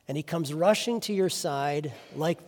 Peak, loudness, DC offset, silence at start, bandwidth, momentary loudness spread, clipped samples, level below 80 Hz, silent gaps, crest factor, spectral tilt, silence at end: -8 dBFS; -28 LUFS; under 0.1%; 0.1 s; 18 kHz; 8 LU; under 0.1%; -74 dBFS; none; 20 dB; -4.5 dB/octave; 0 s